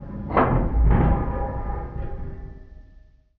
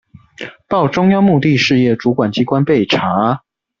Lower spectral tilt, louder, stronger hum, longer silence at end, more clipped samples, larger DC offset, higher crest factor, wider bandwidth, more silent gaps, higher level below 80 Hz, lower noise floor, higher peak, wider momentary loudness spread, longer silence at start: first, -8.5 dB/octave vs -6.5 dB/octave; second, -24 LUFS vs -14 LUFS; neither; about the same, 0.4 s vs 0.45 s; neither; neither; first, 18 dB vs 12 dB; second, 3.6 kHz vs 7.4 kHz; neither; first, -26 dBFS vs -50 dBFS; first, -51 dBFS vs -33 dBFS; about the same, -4 dBFS vs -2 dBFS; first, 17 LU vs 11 LU; second, 0 s vs 0.4 s